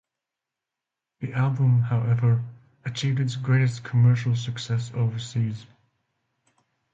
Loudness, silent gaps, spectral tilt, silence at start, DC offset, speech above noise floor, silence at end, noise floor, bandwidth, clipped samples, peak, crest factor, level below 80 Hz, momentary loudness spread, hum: -24 LUFS; none; -7 dB/octave; 1.2 s; under 0.1%; 64 dB; 1.3 s; -87 dBFS; 7.8 kHz; under 0.1%; -10 dBFS; 16 dB; -58 dBFS; 12 LU; none